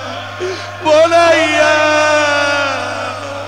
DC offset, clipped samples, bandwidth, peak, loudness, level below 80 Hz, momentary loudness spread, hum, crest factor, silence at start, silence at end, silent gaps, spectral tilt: 0.4%; under 0.1%; 12 kHz; -2 dBFS; -12 LUFS; -54 dBFS; 13 LU; 50 Hz at -35 dBFS; 12 dB; 0 s; 0 s; none; -3 dB/octave